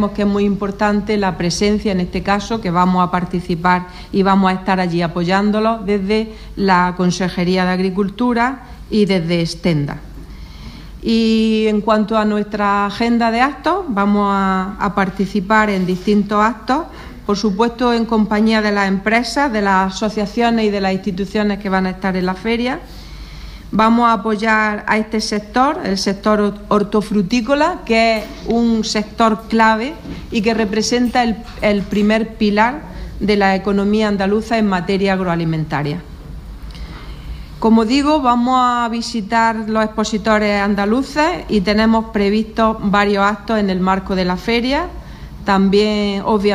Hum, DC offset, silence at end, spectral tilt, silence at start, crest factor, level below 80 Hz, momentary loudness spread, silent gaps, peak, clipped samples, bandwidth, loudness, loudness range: none; under 0.1%; 0 s; -5.5 dB/octave; 0 s; 16 dB; -36 dBFS; 8 LU; none; 0 dBFS; under 0.1%; 12 kHz; -16 LUFS; 2 LU